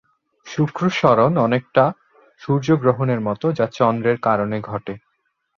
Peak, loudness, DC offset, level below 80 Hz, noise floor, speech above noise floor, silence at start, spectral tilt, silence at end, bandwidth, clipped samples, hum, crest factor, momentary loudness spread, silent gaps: -2 dBFS; -19 LUFS; under 0.1%; -56 dBFS; -70 dBFS; 52 dB; 0.45 s; -7.5 dB/octave; 0.6 s; 7.2 kHz; under 0.1%; none; 18 dB; 13 LU; none